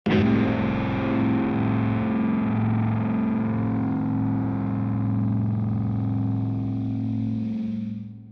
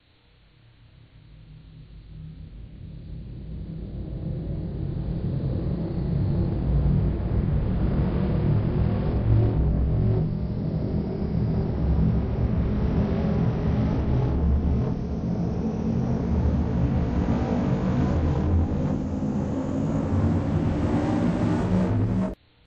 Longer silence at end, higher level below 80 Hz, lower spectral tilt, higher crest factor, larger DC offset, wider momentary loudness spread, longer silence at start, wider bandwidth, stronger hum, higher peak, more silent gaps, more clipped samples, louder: second, 0 s vs 0.35 s; second, -48 dBFS vs -30 dBFS; about the same, -10 dB/octave vs -10 dB/octave; about the same, 12 dB vs 16 dB; neither; second, 5 LU vs 11 LU; second, 0.05 s vs 1.3 s; second, 5.8 kHz vs 7.6 kHz; neither; about the same, -10 dBFS vs -8 dBFS; neither; neither; about the same, -25 LUFS vs -25 LUFS